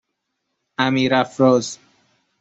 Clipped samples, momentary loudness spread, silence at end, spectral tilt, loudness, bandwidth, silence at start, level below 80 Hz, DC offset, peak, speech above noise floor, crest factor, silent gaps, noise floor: under 0.1%; 16 LU; 0.65 s; -5 dB/octave; -18 LUFS; 8.2 kHz; 0.8 s; -60 dBFS; under 0.1%; -2 dBFS; 59 dB; 20 dB; none; -76 dBFS